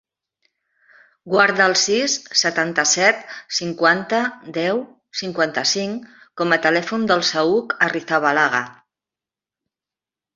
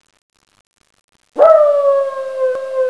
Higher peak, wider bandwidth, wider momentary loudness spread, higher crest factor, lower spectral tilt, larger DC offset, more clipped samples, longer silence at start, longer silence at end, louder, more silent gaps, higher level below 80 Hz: about the same, 0 dBFS vs 0 dBFS; second, 7.8 kHz vs 11 kHz; about the same, 11 LU vs 11 LU; about the same, 20 dB vs 16 dB; second, -2 dB/octave vs -3.5 dB/octave; neither; neither; about the same, 1.25 s vs 1.35 s; first, 1.65 s vs 0 s; second, -18 LUFS vs -13 LUFS; neither; about the same, -66 dBFS vs -64 dBFS